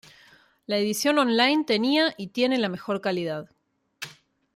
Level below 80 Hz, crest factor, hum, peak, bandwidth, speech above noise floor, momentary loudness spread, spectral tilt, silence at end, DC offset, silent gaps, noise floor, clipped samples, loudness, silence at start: -74 dBFS; 20 dB; none; -6 dBFS; 16 kHz; 41 dB; 18 LU; -4 dB/octave; 0.45 s; under 0.1%; none; -65 dBFS; under 0.1%; -24 LUFS; 0.7 s